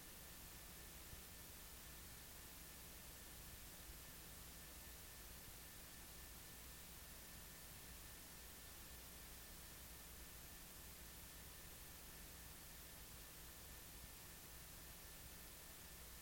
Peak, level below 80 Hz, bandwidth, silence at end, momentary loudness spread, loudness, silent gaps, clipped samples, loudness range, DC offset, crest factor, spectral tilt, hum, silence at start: -42 dBFS; -64 dBFS; 17 kHz; 0 s; 0 LU; -56 LUFS; none; under 0.1%; 0 LU; under 0.1%; 16 dB; -2.5 dB/octave; none; 0 s